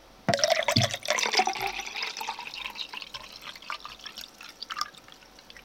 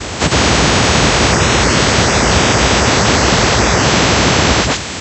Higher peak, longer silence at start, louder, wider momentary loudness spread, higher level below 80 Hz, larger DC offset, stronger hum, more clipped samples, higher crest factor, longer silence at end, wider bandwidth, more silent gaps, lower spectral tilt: about the same, -2 dBFS vs 0 dBFS; about the same, 0 s vs 0 s; second, -28 LUFS vs -11 LUFS; first, 18 LU vs 1 LU; second, -62 dBFS vs -22 dBFS; neither; neither; neither; first, 28 dB vs 12 dB; about the same, 0 s vs 0 s; first, 17 kHz vs 9 kHz; neither; about the same, -2.5 dB/octave vs -3.5 dB/octave